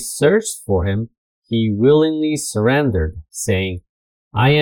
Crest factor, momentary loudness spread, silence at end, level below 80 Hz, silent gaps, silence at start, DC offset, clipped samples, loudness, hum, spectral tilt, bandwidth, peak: 16 dB; 12 LU; 0 s; -40 dBFS; 1.17-1.42 s, 3.89-4.31 s; 0 s; under 0.1%; under 0.1%; -18 LUFS; none; -5.5 dB/octave; 18 kHz; -2 dBFS